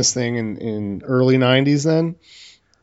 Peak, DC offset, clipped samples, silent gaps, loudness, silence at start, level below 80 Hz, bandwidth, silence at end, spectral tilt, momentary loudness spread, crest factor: -2 dBFS; under 0.1%; under 0.1%; none; -18 LUFS; 0 s; -58 dBFS; 8 kHz; 0.4 s; -5 dB/octave; 11 LU; 16 dB